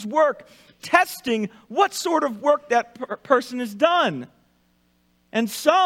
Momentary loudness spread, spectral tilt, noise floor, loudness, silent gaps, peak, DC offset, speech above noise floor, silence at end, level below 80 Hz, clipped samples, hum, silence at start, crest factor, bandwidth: 12 LU; -3.5 dB/octave; -64 dBFS; -22 LUFS; none; -2 dBFS; under 0.1%; 42 dB; 0 s; -70 dBFS; under 0.1%; 60 Hz at -60 dBFS; 0 s; 20 dB; 16.5 kHz